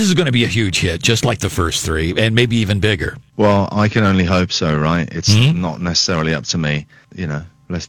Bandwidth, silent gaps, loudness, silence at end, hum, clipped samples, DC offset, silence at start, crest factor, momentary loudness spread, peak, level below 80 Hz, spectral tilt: 19 kHz; none; -16 LUFS; 0 s; none; under 0.1%; under 0.1%; 0 s; 16 dB; 9 LU; 0 dBFS; -36 dBFS; -4.5 dB/octave